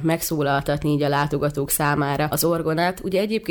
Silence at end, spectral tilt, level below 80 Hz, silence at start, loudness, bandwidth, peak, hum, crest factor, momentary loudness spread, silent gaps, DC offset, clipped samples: 0 s; -5 dB/octave; -44 dBFS; 0 s; -22 LUFS; over 20 kHz; -8 dBFS; none; 14 dB; 2 LU; none; under 0.1%; under 0.1%